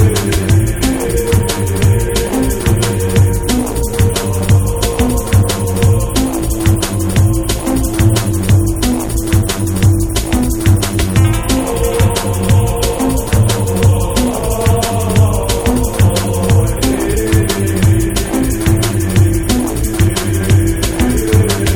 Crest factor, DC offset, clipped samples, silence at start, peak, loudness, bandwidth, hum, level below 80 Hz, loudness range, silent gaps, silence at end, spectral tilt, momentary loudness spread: 12 dB; under 0.1%; under 0.1%; 0 s; 0 dBFS; -13 LUFS; 19 kHz; none; -20 dBFS; 1 LU; none; 0 s; -5.5 dB/octave; 3 LU